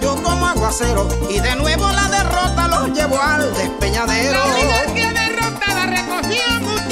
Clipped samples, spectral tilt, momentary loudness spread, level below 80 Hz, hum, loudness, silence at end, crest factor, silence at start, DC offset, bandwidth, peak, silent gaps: under 0.1%; -3.5 dB/octave; 4 LU; -26 dBFS; none; -16 LUFS; 0 s; 14 dB; 0 s; 0.2%; 16 kHz; -2 dBFS; none